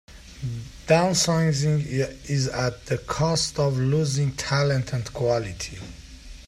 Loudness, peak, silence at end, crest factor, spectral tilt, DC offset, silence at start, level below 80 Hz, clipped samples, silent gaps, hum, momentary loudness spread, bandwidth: -24 LUFS; -6 dBFS; 0 s; 18 dB; -5 dB/octave; under 0.1%; 0.1 s; -46 dBFS; under 0.1%; none; none; 14 LU; 13.5 kHz